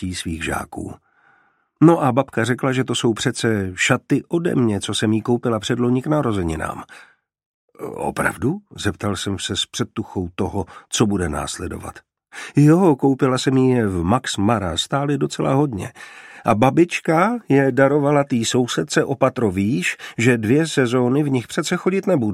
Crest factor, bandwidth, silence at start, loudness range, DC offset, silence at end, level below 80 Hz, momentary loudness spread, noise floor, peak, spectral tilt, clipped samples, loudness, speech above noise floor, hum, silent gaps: 18 dB; 15 kHz; 0 s; 6 LU; under 0.1%; 0 s; -46 dBFS; 11 LU; -60 dBFS; -2 dBFS; -5.5 dB/octave; under 0.1%; -19 LUFS; 41 dB; none; 7.46-7.68 s